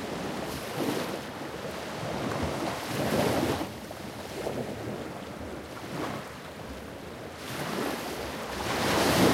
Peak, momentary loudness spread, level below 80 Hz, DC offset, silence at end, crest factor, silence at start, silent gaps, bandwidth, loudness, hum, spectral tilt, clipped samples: -10 dBFS; 13 LU; -52 dBFS; under 0.1%; 0 s; 22 dB; 0 s; none; 16 kHz; -32 LUFS; none; -4.5 dB/octave; under 0.1%